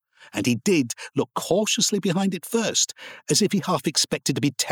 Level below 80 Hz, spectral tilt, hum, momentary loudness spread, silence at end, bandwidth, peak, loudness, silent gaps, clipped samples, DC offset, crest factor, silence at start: -66 dBFS; -3.5 dB/octave; none; 7 LU; 0 s; 19 kHz; -8 dBFS; -23 LUFS; none; under 0.1%; under 0.1%; 14 dB; 0.2 s